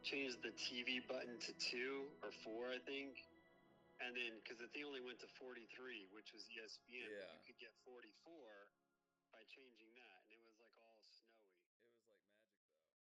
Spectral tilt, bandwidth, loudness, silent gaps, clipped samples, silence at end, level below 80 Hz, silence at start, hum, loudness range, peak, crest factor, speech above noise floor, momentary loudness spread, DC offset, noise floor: -2 dB/octave; 10.5 kHz; -50 LUFS; 11.66-11.80 s; under 0.1%; 0.95 s; under -90 dBFS; 0 s; none; 20 LU; -32 dBFS; 22 dB; over 38 dB; 20 LU; under 0.1%; under -90 dBFS